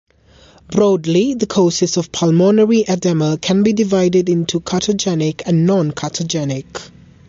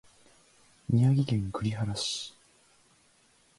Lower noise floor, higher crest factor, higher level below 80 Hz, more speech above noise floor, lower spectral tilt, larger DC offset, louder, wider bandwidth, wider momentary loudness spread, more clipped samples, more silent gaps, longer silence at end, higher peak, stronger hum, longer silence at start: second, -47 dBFS vs -65 dBFS; second, 12 dB vs 18 dB; first, -50 dBFS vs -56 dBFS; second, 32 dB vs 37 dB; about the same, -5.5 dB/octave vs -6 dB/octave; neither; first, -15 LUFS vs -29 LUFS; second, 7.8 kHz vs 11.5 kHz; second, 8 LU vs 14 LU; neither; neither; second, 0.4 s vs 1.3 s; first, -2 dBFS vs -14 dBFS; neither; second, 0.7 s vs 0.9 s